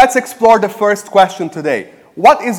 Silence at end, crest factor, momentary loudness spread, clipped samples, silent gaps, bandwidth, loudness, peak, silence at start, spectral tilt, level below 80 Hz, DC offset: 0 s; 12 dB; 10 LU; 1%; none; 17.5 kHz; -12 LUFS; 0 dBFS; 0 s; -4 dB/octave; -52 dBFS; under 0.1%